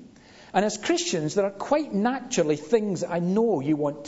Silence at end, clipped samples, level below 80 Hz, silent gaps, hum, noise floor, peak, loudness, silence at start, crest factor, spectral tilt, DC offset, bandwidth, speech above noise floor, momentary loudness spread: 0 s; under 0.1%; -64 dBFS; none; none; -50 dBFS; -8 dBFS; -25 LUFS; 0 s; 18 dB; -5 dB/octave; under 0.1%; 8 kHz; 25 dB; 3 LU